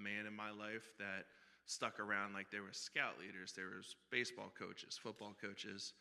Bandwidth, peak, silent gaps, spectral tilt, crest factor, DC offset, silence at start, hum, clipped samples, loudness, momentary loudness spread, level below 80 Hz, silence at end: 14 kHz; -24 dBFS; none; -2.5 dB/octave; 24 dB; under 0.1%; 0 s; none; under 0.1%; -47 LUFS; 10 LU; under -90 dBFS; 0 s